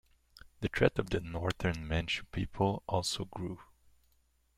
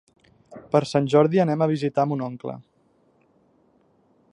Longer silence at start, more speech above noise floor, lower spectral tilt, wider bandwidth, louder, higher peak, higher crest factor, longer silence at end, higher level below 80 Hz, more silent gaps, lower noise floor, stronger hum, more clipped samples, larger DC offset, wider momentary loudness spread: about the same, 0.6 s vs 0.5 s; second, 38 dB vs 42 dB; second, -5 dB/octave vs -7.5 dB/octave; first, 15 kHz vs 10.5 kHz; second, -34 LUFS vs -22 LUFS; second, -12 dBFS vs -4 dBFS; about the same, 24 dB vs 20 dB; second, 0.95 s vs 1.7 s; first, -50 dBFS vs -66 dBFS; neither; first, -72 dBFS vs -63 dBFS; neither; neither; neither; second, 10 LU vs 16 LU